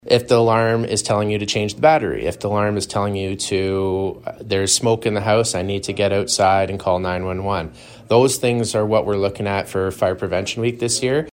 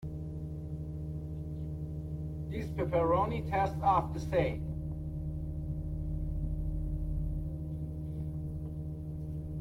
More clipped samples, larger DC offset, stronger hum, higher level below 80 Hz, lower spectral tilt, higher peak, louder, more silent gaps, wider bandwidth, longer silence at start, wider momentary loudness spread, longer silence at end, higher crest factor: neither; neither; neither; second, -48 dBFS vs -42 dBFS; second, -4.5 dB/octave vs -8.5 dB/octave; first, -2 dBFS vs -16 dBFS; first, -19 LUFS vs -36 LUFS; neither; first, 16.5 kHz vs 10 kHz; about the same, 0.05 s vs 0 s; second, 8 LU vs 11 LU; about the same, 0.05 s vs 0 s; about the same, 18 dB vs 18 dB